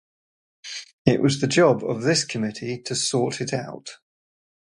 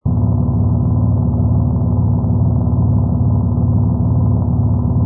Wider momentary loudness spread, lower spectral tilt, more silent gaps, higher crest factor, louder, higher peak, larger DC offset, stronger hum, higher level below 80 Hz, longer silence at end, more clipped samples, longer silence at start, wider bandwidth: first, 17 LU vs 1 LU; second, -4.5 dB/octave vs -18.5 dB/octave; first, 0.93-1.05 s vs none; first, 24 dB vs 10 dB; second, -22 LUFS vs -15 LUFS; about the same, -2 dBFS vs -4 dBFS; neither; neither; second, -58 dBFS vs -24 dBFS; first, 0.75 s vs 0 s; neither; first, 0.65 s vs 0.05 s; first, 11.5 kHz vs 1.5 kHz